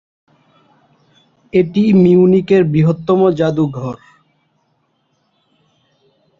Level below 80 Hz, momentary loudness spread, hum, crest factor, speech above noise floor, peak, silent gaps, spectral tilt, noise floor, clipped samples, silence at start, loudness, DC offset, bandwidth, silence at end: -52 dBFS; 12 LU; none; 14 dB; 51 dB; -2 dBFS; none; -9.5 dB/octave; -63 dBFS; under 0.1%; 1.55 s; -13 LUFS; under 0.1%; 7.2 kHz; 2.45 s